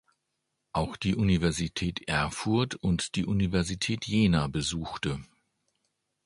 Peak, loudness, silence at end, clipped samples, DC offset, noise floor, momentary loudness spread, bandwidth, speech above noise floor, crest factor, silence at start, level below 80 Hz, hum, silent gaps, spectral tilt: -10 dBFS; -29 LUFS; 1 s; under 0.1%; under 0.1%; -81 dBFS; 7 LU; 11.5 kHz; 53 dB; 18 dB; 0.75 s; -46 dBFS; none; none; -5 dB/octave